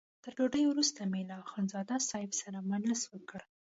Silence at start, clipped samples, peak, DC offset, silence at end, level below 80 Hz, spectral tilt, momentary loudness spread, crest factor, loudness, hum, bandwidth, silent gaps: 0.25 s; under 0.1%; -18 dBFS; under 0.1%; 0.25 s; -74 dBFS; -3.5 dB/octave; 13 LU; 18 dB; -34 LUFS; none; 8 kHz; none